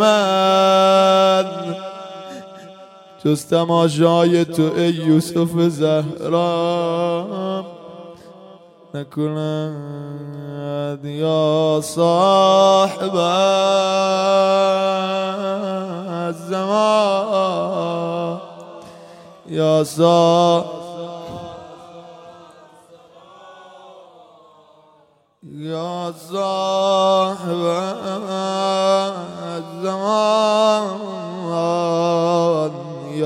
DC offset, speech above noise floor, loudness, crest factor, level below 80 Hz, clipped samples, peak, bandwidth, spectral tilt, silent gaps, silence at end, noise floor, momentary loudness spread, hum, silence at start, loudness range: under 0.1%; 39 dB; -18 LUFS; 16 dB; -66 dBFS; under 0.1%; -2 dBFS; 16 kHz; -5.5 dB/octave; none; 0 s; -56 dBFS; 17 LU; none; 0 s; 11 LU